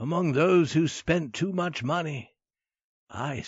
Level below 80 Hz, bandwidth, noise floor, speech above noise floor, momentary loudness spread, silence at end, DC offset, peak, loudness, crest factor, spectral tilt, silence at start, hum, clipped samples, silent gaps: -58 dBFS; 8 kHz; under -90 dBFS; over 64 dB; 13 LU; 0 s; under 0.1%; -12 dBFS; -26 LUFS; 16 dB; -5.5 dB/octave; 0 s; none; under 0.1%; 2.84-3.07 s